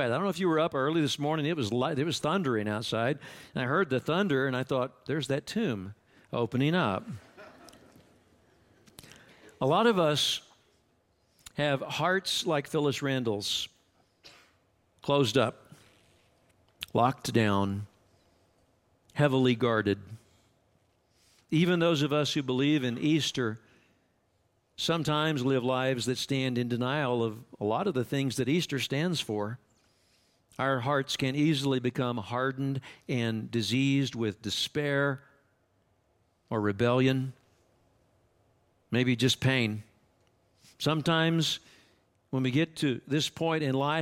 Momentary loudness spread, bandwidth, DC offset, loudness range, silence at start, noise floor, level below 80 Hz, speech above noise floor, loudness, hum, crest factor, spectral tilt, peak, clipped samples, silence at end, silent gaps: 9 LU; 16.5 kHz; under 0.1%; 3 LU; 0 s; -72 dBFS; -68 dBFS; 43 dB; -29 LUFS; none; 20 dB; -5.5 dB/octave; -12 dBFS; under 0.1%; 0 s; none